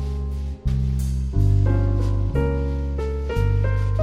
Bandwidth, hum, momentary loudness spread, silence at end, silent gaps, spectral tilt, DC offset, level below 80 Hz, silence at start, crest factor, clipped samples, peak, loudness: 10.5 kHz; none; 7 LU; 0 s; none; -8.5 dB/octave; under 0.1%; -24 dBFS; 0 s; 12 dB; under 0.1%; -8 dBFS; -23 LUFS